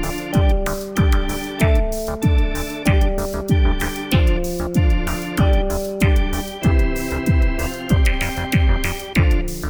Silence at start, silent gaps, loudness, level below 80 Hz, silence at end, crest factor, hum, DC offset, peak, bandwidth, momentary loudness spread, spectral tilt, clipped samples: 0 s; none; -19 LUFS; -20 dBFS; 0 s; 14 dB; none; under 0.1%; -4 dBFS; over 20 kHz; 5 LU; -6 dB/octave; under 0.1%